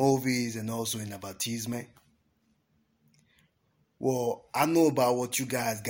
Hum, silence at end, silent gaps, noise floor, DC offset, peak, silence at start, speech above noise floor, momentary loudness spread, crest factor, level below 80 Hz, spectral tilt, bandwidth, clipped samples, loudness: none; 0 s; none; -72 dBFS; under 0.1%; -10 dBFS; 0 s; 43 dB; 11 LU; 20 dB; -70 dBFS; -4.5 dB/octave; 17 kHz; under 0.1%; -29 LUFS